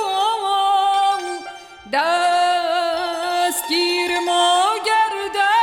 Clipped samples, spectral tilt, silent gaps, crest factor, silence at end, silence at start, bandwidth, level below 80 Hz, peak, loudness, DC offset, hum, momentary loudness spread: under 0.1%; -0.5 dB/octave; none; 12 dB; 0 s; 0 s; 17 kHz; -62 dBFS; -6 dBFS; -18 LUFS; under 0.1%; none; 7 LU